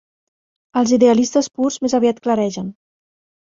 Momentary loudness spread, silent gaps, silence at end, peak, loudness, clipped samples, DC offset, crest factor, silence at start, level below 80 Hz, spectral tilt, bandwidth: 11 LU; none; 0.7 s; -2 dBFS; -17 LUFS; under 0.1%; under 0.1%; 16 dB; 0.75 s; -58 dBFS; -5 dB/octave; 7.8 kHz